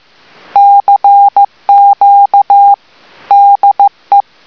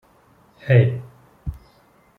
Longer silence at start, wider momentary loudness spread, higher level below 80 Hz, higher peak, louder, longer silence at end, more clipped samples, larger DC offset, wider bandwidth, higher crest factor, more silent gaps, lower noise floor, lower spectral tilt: about the same, 0.55 s vs 0.65 s; second, 6 LU vs 19 LU; second, -62 dBFS vs -44 dBFS; first, 0 dBFS vs -4 dBFS; first, -6 LUFS vs -18 LUFS; second, 0.25 s vs 0.65 s; first, 3% vs under 0.1%; first, 0.3% vs under 0.1%; first, 5.4 kHz vs 4.2 kHz; second, 6 dB vs 20 dB; neither; second, -41 dBFS vs -56 dBFS; second, -3.5 dB/octave vs -9.5 dB/octave